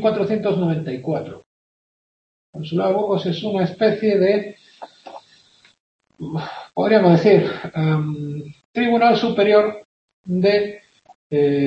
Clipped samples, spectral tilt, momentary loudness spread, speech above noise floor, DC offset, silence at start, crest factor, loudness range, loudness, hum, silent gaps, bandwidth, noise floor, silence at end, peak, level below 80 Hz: under 0.1%; -8 dB/octave; 18 LU; 36 dB; under 0.1%; 0 s; 18 dB; 6 LU; -19 LUFS; none; 1.46-2.53 s, 5.80-5.99 s, 8.65-8.73 s, 9.85-10.24 s, 11.15-11.30 s; 7.8 kHz; -54 dBFS; 0 s; -2 dBFS; -62 dBFS